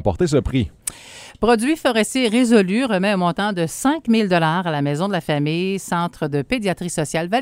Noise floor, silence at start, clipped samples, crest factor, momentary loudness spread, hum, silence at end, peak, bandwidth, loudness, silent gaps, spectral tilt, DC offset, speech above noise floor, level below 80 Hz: -40 dBFS; 0 s; under 0.1%; 18 dB; 7 LU; none; 0 s; 0 dBFS; 16 kHz; -19 LUFS; none; -5 dB/octave; under 0.1%; 22 dB; -40 dBFS